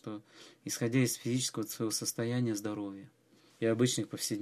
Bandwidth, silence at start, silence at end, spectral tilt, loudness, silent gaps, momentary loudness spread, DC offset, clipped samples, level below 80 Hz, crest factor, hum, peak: 15 kHz; 0.05 s; 0 s; -4.5 dB/octave; -33 LUFS; none; 14 LU; under 0.1%; under 0.1%; -76 dBFS; 18 dB; none; -16 dBFS